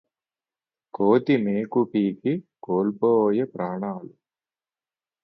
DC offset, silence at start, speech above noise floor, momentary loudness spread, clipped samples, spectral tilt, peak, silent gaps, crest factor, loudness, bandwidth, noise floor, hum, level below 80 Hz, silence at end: under 0.1%; 1 s; over 67 dB; 11 LU; under 0.1%; -10 dB/octave; -6 dBFS; none; 18 dB; -24 LUFS; 5.6 kHz; under -90 dBFS; none; -70 dBFS; 1.15 s